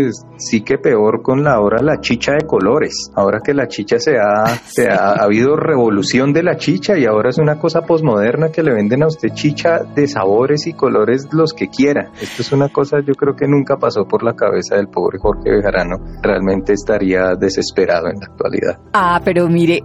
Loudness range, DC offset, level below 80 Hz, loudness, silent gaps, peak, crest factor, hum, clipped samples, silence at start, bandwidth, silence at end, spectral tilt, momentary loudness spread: 2 LU; under 0.1%; -38 dBFS; -14 LUFS; none; -2 dBFS; 12 dB; none; under 0.1%; 0 s; 13.5 kHz; 0 s; -6 dB/octave; 5 LU